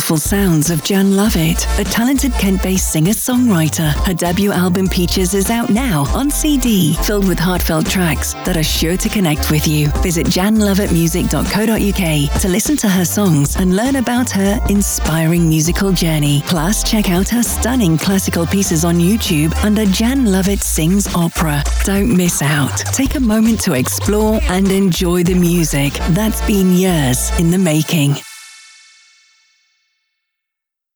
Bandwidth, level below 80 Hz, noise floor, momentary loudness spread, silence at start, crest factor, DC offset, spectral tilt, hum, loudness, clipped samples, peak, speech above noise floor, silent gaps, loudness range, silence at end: over 20 kHz; -24 dBFS; -82 dBFS; 3 LU; 0 s; 10 dB; under 0.1%; -5 dB/octave; none; -14 LUFS; under 0.1%; -4 dBFS; 68 dB; none; 1 LU; 2.4 s